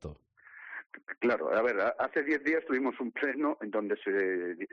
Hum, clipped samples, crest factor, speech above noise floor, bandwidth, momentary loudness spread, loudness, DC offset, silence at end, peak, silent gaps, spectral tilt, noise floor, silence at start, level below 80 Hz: none; under 0.1%; 12 dB; 24 dB; 6.8 kHz; 16 LU; -31 LUFS; under 0.1%; 0.05 s; -20 dBFS; 0.86-0.90 s; -4 dB/octave; -55 dBFS; 0.05 s; -66 dBFS